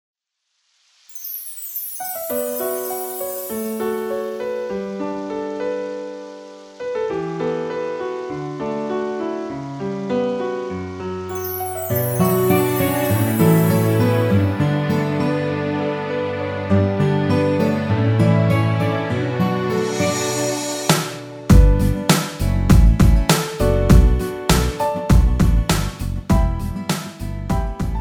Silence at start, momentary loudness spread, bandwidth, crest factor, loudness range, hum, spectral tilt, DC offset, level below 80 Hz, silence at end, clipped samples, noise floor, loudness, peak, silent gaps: 1.1 s; 12 LU; over 20 kHz; 18 dB; 9 LU; none; -6 dB/octave; under 0.1%; -24 dBFS; 0 s; under 0.1%; -72 dBFS; -20 LUFS; 0 dBFS; none